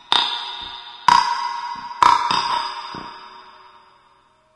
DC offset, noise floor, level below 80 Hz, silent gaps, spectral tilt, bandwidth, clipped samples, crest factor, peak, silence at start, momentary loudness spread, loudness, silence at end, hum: under 0.1%; -57 dBFS; -56 dBFS; none; -1 dB/octave; 11.5 kHz; under 0.1%; 22 dB; 0 dBFS; 0.1 s; 18 LU; -19 LUFS; 1.05 s; none